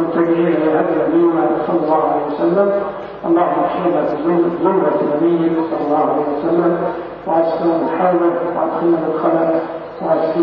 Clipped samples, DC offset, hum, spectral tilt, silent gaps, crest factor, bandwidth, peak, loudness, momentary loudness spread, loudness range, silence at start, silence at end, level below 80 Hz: under 0.1%; under 0.1%; none; -10.5 dB/octave; none; 14 dB; 5 kHz; -2 dBFS; -16 LUFS; 4 LU; 1 LU; 0 s; 0 s; -54 dBFS